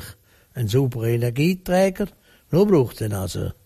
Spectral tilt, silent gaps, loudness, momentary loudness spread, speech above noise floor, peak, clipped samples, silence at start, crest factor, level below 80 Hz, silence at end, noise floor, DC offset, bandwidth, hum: -7 dB/octave; none; -21 LUFS; 12 LU; 24 dB; -6 dBFS; under 0.1%; 0 s; 16 dB; -46 dBFS; 0.15 s; -45 dBFS; under 0.1%; 15.5 kHz; none